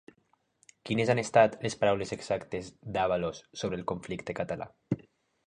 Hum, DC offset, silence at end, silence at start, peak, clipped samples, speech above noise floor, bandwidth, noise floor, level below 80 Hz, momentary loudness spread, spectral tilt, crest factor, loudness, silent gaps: none; under 0.1%; 0.45 s; 0.85 s; -8 dBFS; under 0.1%; 42 dB; 10.5 kHz; -72 dBFS; -60 dBFS; 13 LU; -5.5 dB/octave; 24 dB; -31 LUFS; none